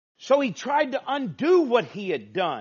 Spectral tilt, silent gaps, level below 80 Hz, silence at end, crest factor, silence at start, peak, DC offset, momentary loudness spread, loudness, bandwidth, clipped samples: -3.5 dB/octave; none; -78 dBFS; 0 s; 16 dB; 0.2 s; -8 dBFS; under 0.1%; 9 LU; -24 LUFS; 7.2 kHz; under 0.1%